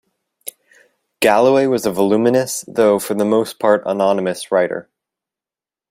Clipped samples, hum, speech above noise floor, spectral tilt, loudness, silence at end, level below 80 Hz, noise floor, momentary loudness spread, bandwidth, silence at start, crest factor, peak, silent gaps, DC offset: under 0.1%; none; over 75 dB; -4.5 dB/octave; -16 LUFS; 1.1 s; -60 dBFS; under -90 dBFS; 14 LU; 16 kHz; 1.2 s; 16 dB; 0 dBFS; none; under 0.1%